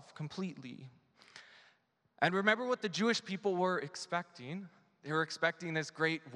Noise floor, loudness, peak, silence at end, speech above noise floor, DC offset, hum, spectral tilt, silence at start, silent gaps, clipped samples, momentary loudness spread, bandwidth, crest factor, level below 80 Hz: -73 dBFS; -35 LUFS; -12 dBFS; 0 s; 38 dB; under 0.1%; none; -4.5 dB/octave; 0 s; none; under 0.1%; 21 LU; 11.5 kHz; 24 dB; -86 dBFS